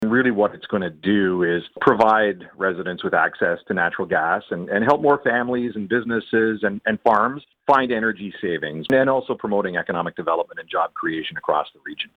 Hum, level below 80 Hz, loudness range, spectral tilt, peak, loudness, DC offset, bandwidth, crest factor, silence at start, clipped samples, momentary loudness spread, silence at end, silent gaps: none; -60 dBFS; 3 LU; -7.5 dB/octave; -2 dBFS; -21 LUFS; under 0.1%; 7.8 kHz; 18 dB; 0 s; under 0.1%; 8 LU; 0.1 s; none